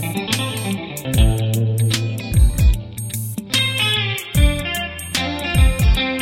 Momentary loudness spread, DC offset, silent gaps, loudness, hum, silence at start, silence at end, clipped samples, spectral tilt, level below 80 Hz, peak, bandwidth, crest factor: 9 LU; under 0.1%; none; -19 LUFS; none; 0 s; 0 s; under 0.1%; -4.5 dB/octave; -20 dBFS; -2 dBFS; 16.5 kHz; 16 dB